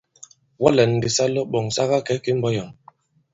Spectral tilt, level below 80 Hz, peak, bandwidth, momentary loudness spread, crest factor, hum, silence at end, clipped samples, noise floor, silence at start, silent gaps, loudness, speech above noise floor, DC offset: -5 dB/octave; -54 dBFS; 0 dBFS; 8 kHz; 7 LU; 22 dB; none; 0.6 s; under 0.1%; -53 dBFS; 0.6 s; none; -21 LUFS; 33 dB; under 0.1%